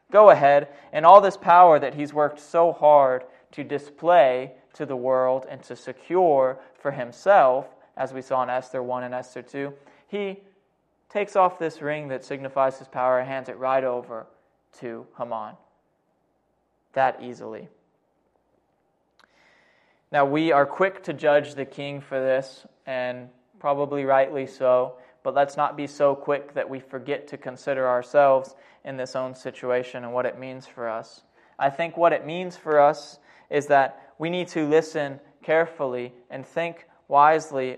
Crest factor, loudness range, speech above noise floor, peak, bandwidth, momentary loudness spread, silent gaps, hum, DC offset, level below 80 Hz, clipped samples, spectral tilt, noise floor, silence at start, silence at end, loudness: 22 dB; 11 LU; 48 dB; 0 dBFS; 9.6 kHz; 19 LU; none; none; under 0.1%; -76 dBFS; under 0.1%; -6 dB/octave; -70 dBFS; 0.1 s; 0 s; -22 LUFS